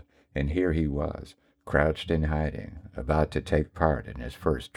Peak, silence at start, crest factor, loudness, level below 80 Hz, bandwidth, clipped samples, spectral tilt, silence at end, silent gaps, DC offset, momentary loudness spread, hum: -8 dBFS; 0.35 s; 20 dB; -28 LUFS; -36 dBFS; 11.5 kHz; under 0.1%; -7.5 dB/octave; 0.1 s; none; under 0.1%; 13 LU; none